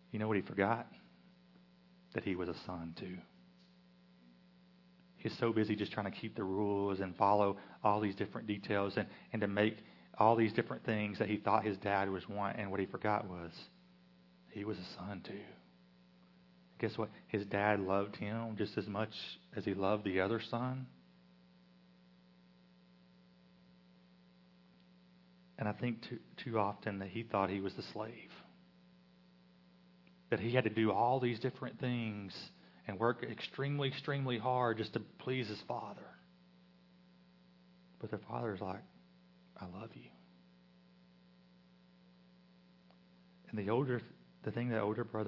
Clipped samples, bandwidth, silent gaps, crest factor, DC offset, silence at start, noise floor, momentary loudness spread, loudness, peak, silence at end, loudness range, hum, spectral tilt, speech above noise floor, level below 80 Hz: under 0.1%; 6 kHz; none; 24 dB; under 0.1%; 0.1 s; -65 dBFS; 16 LU; -38 LUFS; -14 dBFS; 0 s; 12 LU; none; -5 dB/octave; 28 dB; -80 dBFS